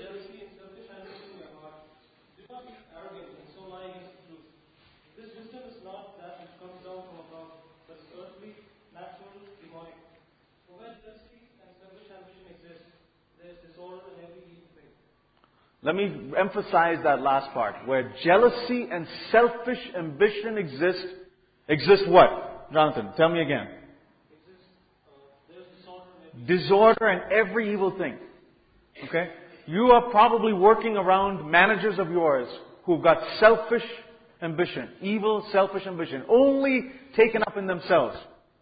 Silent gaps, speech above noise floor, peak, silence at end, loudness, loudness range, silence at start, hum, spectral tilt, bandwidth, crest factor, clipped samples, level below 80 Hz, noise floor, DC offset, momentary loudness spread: none; 42 dB; -4 dBFS; 0.4 s; -23 LUFS; 8 LU; 0 s; none; -9.5 dB/octave; 5 kHz; 22 dB; under 0.1%; -62 dBFS; -65 dBFS; under 0.1%; 25 LU